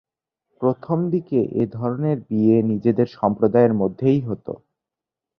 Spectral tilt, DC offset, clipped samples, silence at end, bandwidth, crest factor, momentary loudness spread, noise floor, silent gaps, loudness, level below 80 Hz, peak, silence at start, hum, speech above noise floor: -11 dB/octave; under 0.1%; under 0.1%; 0.8 s; 5.8 kHz; 18 dB; 7 LU; -87 dBFS; none; -20 LUFS; -58 dBFS; -4 dBFS; 0.6 s; none; 67 dB